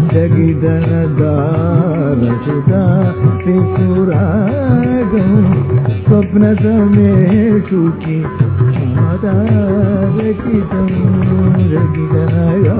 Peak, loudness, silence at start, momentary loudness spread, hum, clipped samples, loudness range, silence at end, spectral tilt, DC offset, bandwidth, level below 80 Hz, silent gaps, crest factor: 0 dBFS; -12 LUFS; 0 s; 4 LU; none; 0.1%; 2 LU; 0 s; -13.5 dB/octave; 0.1%; 4 kHz; -30 dBFS; none; 10 dB